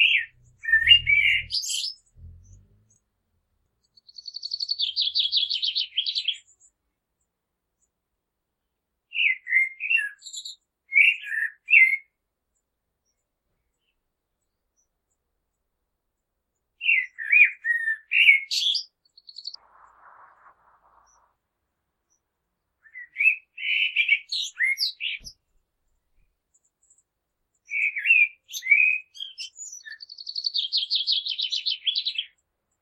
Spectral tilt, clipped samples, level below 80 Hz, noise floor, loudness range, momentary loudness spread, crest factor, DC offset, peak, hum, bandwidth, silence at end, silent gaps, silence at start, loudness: 3 dB/octave; under 0.1%; -60 dBFS; -81 dBFS; 10 LU; 21 LU; 24 dB; under 0.1%; -4 dBFS; none; 15 kHz; 0.55 s; none; 0 s; -21 LUFS